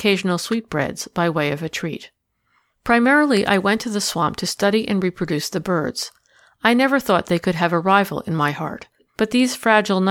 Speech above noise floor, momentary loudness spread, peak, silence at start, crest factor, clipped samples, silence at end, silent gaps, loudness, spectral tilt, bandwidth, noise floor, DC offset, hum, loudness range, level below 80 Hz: 47 dB; 11 LU; -2 dBFS; 0 s; 18 dB; under 0.1%; 0 s; none; -19 LUFS; -4.5 dB/octave; 17.5 kHz; -66 dBFS; under 0.1%; none; 2 LU; -54 dBFS